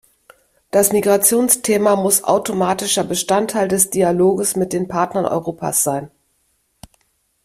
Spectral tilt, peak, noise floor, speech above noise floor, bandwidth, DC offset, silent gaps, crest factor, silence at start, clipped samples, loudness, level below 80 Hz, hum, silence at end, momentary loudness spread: -3.5 dB/octave; 0 dBFS; -64 dBFS; 48 dB; 16 kHz; under 0.1%; none; 18 dB; 0.75 s; under 0.1%; -16 LUFS; -56 dBFS; none; 1.4 s; 7 LU